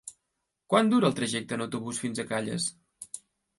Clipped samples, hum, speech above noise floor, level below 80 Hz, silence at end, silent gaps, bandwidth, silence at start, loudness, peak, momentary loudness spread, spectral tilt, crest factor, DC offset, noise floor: under 0.1%; none; 55 dB; -70 dBFS; 0.4 s; none; 11.5 kHz; 0.05 s; -28 LUFS; -8 dBFS; 19 LU; -4.5 dB/octave; 22 dB; under 0.1%; -82 dBFS